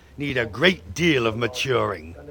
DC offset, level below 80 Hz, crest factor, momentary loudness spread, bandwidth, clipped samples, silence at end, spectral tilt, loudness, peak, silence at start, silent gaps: under 0.1%; -48 dBFS; 20 dB; 7 LU; 18.5 kHz; under 0.1%; 0 s; -5 dB/octave; -22 LUFS; -2 dBFS; 0.15 s; none